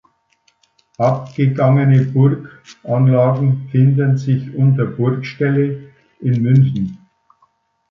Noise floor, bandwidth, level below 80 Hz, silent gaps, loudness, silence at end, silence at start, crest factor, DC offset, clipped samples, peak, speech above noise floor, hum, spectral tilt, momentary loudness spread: -61 dBFS; 6.2 kHz; -54 dBFS; none; -16 LUFS; 0.95 s; 1 s; 14 dB; under 0.1%; under 0.1%; -2 dBFS; 46 dB; none; -10 dB/octave; 9 LU